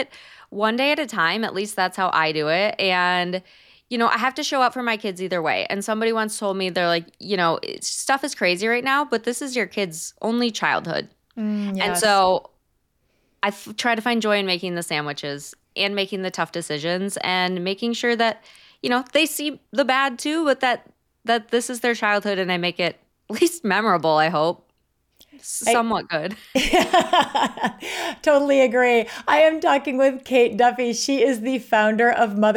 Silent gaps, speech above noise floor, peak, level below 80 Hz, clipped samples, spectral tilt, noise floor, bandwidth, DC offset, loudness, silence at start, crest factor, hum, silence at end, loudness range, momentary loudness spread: none; 47 dB; -6 dBFS; -54 dBFS; under 0.1%; -3.5 dB/octave; -69 dBFS; 18.5 kHz; under 0.1%; -21 LUFS; 0 s; 16 dB; none; 0 s; 5 LU; 9 LU